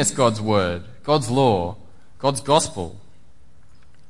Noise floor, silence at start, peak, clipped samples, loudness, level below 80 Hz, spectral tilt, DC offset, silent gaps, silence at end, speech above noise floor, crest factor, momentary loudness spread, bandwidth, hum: -54 dBFS; 0 s; -2 dBFS; under 0.1%; -21 LUFS; -52 dBFS; -4.5 dB/octave; 1%; none; 1.1 s; 34 dB; 20 dB; 12 LU; 11.5 kHz; none